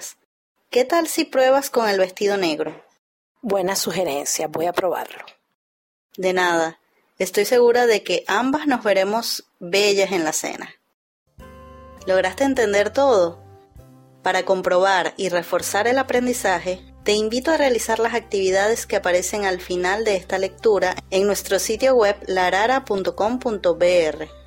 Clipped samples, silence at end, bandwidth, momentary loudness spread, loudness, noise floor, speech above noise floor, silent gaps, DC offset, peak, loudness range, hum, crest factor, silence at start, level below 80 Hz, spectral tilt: under 0.1%; 0.05 s; 16.5 kHz; 8 LU; -20 LUFS; -47 dBFS; 27 dB; 0.25-0.55 s, 2.98-3.35 s, 5.54-6.09 s, 10.94-11.26 s; under 0.1%; -6 dBFS; 4 LU; none; 16 dB; 0 s; -52 dBFS; -3 dB/octave